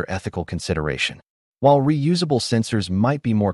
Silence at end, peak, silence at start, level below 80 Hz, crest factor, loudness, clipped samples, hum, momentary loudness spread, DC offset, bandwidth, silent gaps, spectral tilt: 0 s; -4 dBFS; 0 s; -44 dBFS; 16 dB; -21 LUFS; under 0.1%; none; 10 LU; under 0.1%; 11.5 kHz; 1.30-1.53 s; -6 dB/octave